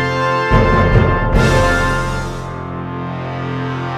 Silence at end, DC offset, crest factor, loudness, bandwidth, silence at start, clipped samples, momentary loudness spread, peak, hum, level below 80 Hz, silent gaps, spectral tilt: 0 s; under 0.1%; 14 dB; -16 LUFS; 13.5 kHz; 0 s; under 0.1%; 12 LU; 0 dBFS; none; -22 dBFS; none; -6.5 dB/octave